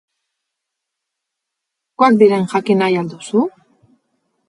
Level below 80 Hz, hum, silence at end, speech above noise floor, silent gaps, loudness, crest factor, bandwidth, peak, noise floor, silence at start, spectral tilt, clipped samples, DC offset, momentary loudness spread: -68 dBFS; none; 1 s; 65 dB; none; -15 LUFS; 18 dB; 11 kHz; 0 dBFS; -79 dBFS; 2 s; -6.5 dB/octave; under 0.1%; under 0.1%; 9 LU